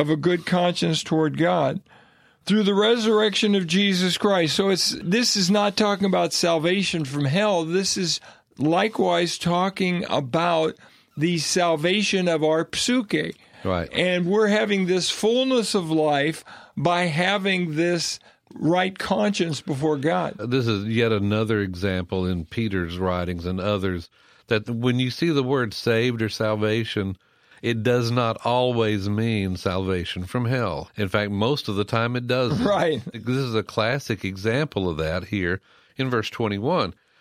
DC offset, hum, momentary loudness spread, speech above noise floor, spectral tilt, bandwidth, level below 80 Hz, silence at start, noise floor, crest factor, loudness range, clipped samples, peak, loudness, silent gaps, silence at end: under 0.1%; none; 7 LU; 33 dB; -5 dB/octave; 15 kHz; -54 dBFS; 0 s; -56 dBFS; 18 dB; 4 LU; under 0.1%; -4 dBFS; -23 LUFS; none; 0.3 s